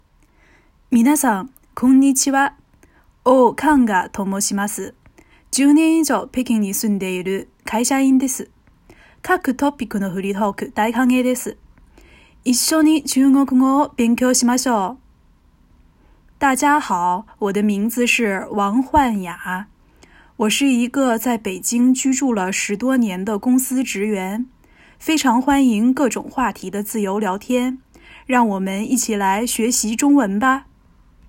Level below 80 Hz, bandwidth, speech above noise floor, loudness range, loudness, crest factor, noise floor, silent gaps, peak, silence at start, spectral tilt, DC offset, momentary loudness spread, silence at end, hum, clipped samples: -50 dBFS; 17 kHz; 37 dB; 4 LU; -18 LUFS; 18 dB; -54 dBFS; none; -2 dBFS; 0.9 s; -4 dB/octave; under 0.1%; 10 LU; 0.65 s; none; under 0.1%